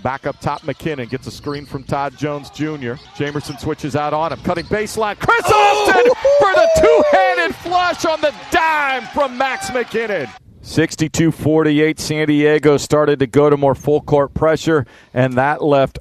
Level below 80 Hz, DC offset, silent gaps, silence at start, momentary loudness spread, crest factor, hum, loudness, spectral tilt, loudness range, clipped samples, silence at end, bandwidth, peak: -42 dBFS; under 0.1%; none; 0.05 s; 13 LU; 16 dB; none; -16 LUFS; -5.5 dB/octave; 10 LU; under 0.1%; 0 s; 14 kHz; 0 dBFS